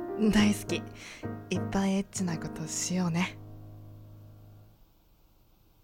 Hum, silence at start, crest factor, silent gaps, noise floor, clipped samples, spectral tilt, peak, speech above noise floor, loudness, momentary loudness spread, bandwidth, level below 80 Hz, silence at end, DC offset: none; 0 s; 20 dB; none; -62 dBFS; under 0.1%; -5 dB/octave; -12 dBFS; 32 dB; -30 LUFS; 24 LU; 16.5 kHz; -52 dBFS; 1.2 s; under 0.1%